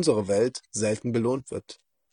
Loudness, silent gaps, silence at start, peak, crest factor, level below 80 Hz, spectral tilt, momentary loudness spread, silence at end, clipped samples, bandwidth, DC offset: -26 LUFS; none; 0 s; -8 dBFS; 18 dB; -64 dBFS; -5 dB/octave; 14 LU; 0.4 s; under 0.1%; 10.5 kHz; under 0.1%